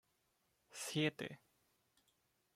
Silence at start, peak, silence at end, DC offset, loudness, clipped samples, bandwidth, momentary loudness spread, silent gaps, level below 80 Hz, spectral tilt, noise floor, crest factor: 0.7 s; -22 dBFS; 1.2 s; under 0.1%; -42 LUFS; under 0.1%; 16 kHz; 18 LU; none; -84 dBFS; -4 dB/octave; -82 dBFS; 24 dB